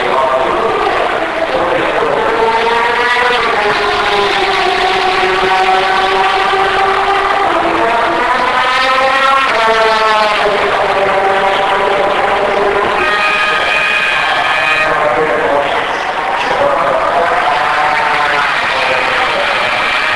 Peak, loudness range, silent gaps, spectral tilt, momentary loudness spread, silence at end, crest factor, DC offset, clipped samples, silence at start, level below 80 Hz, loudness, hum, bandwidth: 0 dBFS; 2 LU; none; -3 dB/octave; 3 LU; 0 s; 12 dB; under 0.1%; under 0.1%; 0 s; -40 dBFS; -11 LUFS; none; 11 kHz